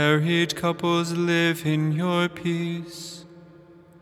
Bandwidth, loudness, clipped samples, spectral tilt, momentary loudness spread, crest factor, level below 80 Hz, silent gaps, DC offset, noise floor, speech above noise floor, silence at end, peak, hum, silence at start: 15.5 kHz; -24 LUFS; under 0.1%; -5.5 dB/octave; 15 LU; 20 dB; -64 dBFS; none; under 0.1%; -50 dBFS; 26 dB; 0.55 s; -4 dBFS; none; 0 s